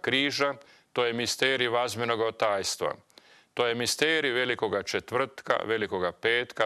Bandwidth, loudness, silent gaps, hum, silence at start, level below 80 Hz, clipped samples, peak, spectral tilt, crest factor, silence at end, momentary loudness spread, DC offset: 13.5 kHz; -27 LUFS; none; none; 0.05 s; -70 dBFS; under 0.1%; -10 dBFS; -2.5 dB/octave; 20 dB; 0 s; 6 LU; under 0.1%